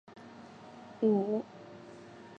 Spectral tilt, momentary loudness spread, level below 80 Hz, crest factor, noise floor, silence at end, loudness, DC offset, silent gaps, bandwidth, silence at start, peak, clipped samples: -8.5 dB/octave; 22 LU; -80 dBFS; 18 dB; -51 dBFS; 0.05 s; -31 LUFS; under 0.1%; none; 8 kHz; 0.1 s; -18 dBFS; under 0.1%